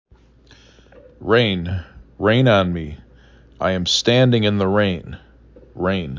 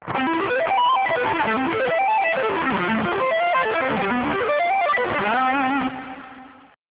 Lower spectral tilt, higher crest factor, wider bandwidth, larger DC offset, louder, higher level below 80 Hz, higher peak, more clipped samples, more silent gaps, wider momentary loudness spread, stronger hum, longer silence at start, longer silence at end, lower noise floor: second, -5.5 dB/octave vs -8.5 dB/octave; about the same, 16 dB vs 12 dB; first, 7.6 kHz vs 4 kHz; neither; first, -18 LUFS vs -21 LUFS; first, -40 dBFS vs -54 dBFS; first, -4 dBFS vs -8 dBFS; neither; neither; first, 15 LU vs 4 LU; neither; first, 1.2 s vs 0 s; second, 0 s vs 0.35 s; first, -50 dBFS vs -46 dBFS